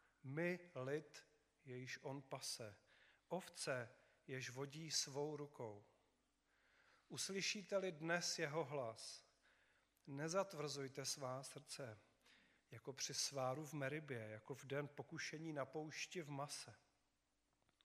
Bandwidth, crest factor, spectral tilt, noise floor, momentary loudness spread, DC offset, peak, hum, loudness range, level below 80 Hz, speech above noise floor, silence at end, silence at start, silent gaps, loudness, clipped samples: 15 kHz; 24 dB; -3.5 dB/octave; -86 dBFS; 14 LU; under 0.1%; -26 dBFS; none; 5 LU; under -90 dBFS; 38 dB; 1.1 s; 0.25 s; none; -48 LUFS; under 0.1%